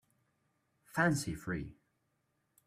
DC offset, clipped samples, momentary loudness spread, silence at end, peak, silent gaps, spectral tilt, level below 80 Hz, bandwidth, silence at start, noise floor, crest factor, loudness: under 0.1%; under 0.1%; 10 LU; 0.95 s; -16 dBFS; none; -5.5 dB/octave; -62 dBFS; 15.5 kHz; 0.95 s; -80 dBFS; 22 dB; -35 LUFS